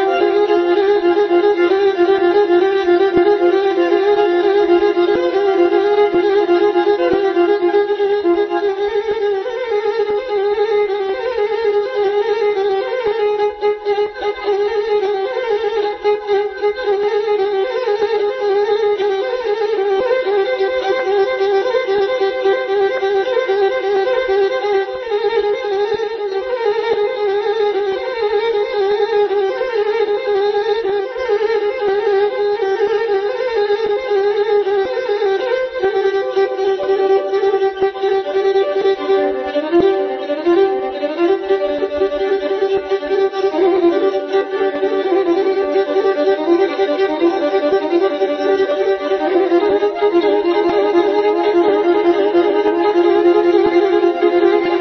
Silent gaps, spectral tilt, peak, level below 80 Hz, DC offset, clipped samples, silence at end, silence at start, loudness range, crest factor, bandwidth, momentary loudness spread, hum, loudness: none; -5.5 dB/octave; -2 dBFS; -54 dBFS; under 0.1%; under 0.1%; 0 s; 0 s; 4 LU; 14 dB; 6.2 kHz; 5 LU; none; -16 LUFS